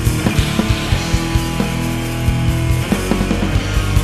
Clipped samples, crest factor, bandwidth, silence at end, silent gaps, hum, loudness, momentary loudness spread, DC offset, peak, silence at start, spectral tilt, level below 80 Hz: under 0.1%; 16 dB; 14 kHz; 0 s; none; none; -17 LUFS; 3 LU; under 0.1%; 0 dBFS; 0 s; -5.5 dB/octave; -22 dBFS